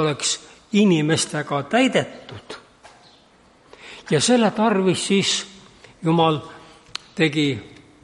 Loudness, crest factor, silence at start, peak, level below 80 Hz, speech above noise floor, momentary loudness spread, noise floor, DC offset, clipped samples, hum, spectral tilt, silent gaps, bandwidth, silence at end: -20 LUFS; 16 dB; 0 s; -6 dBFS; -62 dBFS; 34 dB; 21 LU; -54 dBFS; under 0.1%; under 0.1%; none; -4.5 dB/octave; none; 11.5 kHz; 0.35 s